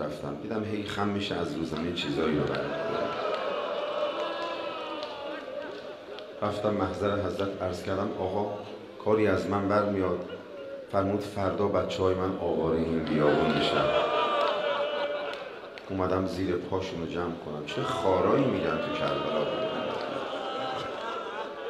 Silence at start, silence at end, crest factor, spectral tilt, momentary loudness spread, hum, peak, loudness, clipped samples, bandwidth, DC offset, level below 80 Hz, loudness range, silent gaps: 0 s; 0 s; 20 dB; -6 dB/octave; 11 LU; none; -10 dBFS; -29 LUFS; under 0.1%; 13.5 kHz; under 0.1%; -58 dBFS; 6 LU; none